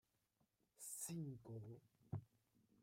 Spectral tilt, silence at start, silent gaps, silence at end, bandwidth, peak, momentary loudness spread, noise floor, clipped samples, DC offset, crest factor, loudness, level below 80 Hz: -5 dB/octave; 0.8 s; none; 0 s; 16 kHz; -36 dBFS; 10 LU; -85 dBFS; under 0.1%; under 0.1%; 20 dB; -53 LUFS; -82 dBFS